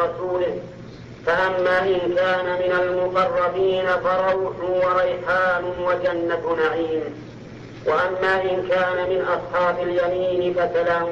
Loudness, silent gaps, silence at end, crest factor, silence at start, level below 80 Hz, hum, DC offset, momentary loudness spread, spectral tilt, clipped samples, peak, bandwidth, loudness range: -21 LUFS; none; 0 s; 12 dB; 0 s; -52 dBFS; none; under 0.1%; 8 LU; -6.5 dB/octave; under 0.1%; -10 dBFS; 7.2 kHz; 2 LU